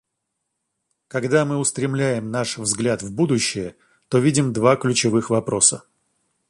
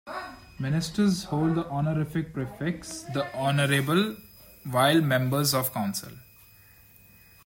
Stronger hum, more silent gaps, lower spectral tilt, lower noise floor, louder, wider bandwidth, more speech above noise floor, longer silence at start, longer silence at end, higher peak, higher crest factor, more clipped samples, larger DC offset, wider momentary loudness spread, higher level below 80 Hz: neither; neither; about the same, -4 dB/octave vs -5 dB/octave; first, -78 dBFS vs -55 dBFS; first, -20 LUFS vs -26 LUFS; second, 11.5 kHz vs 16.5 kHz; first, 58 dB vs 29 dB; first, 1.15 s vs 0.05 s; second, 0.7 s vs 1.25 s; first, -2 dBFS vs -10 dBFS; about the same, 20 dB vs 18 dB; neither; neither; second, 9 LU vs 13 LU; about the same, -58 dBFS vs -56 dBFS